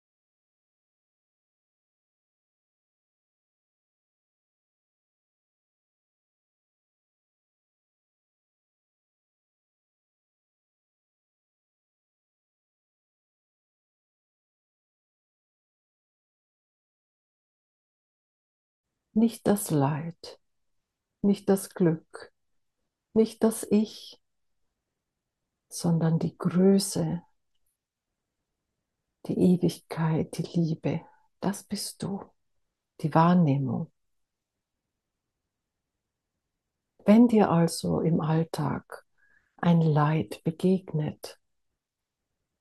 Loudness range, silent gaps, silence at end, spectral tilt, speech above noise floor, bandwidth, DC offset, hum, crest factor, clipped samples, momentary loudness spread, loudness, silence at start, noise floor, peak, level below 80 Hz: 6 LU; none; 1.3 s; -7 dB/octave; 62 dB; 12.5 kHz; under 0.1%; none; 24 dB; under 0.1%; 14 LU; -26 LUFS; 19.15 s; -87 dBFS; -6 dBFS; -68 dBFS